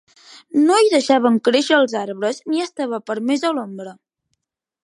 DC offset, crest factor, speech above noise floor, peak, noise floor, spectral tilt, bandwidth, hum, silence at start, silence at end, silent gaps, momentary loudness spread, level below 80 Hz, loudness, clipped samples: under 0.1%; 16 dB; 58 dB; -2 dBFS; -75 dBFS; -3.5 dB/octave; 11.5 kHz; none; 0.3 s; 0.9 s; none; 11 LU; -76 dBFS; -18 LUFS; under 0.1%